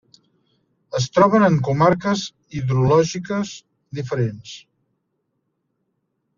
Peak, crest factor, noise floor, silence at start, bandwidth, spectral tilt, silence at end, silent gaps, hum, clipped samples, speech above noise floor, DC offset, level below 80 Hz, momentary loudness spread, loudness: -2 dBFS; 20 dB; -73 dBFS; 0.95 s; 7.4 kHz; -6 dB/octave; 1.8 s; none; none; under 0.1%; 54 dB; under 0.1%; -54 dBFS; 19 LU; -19 LUFS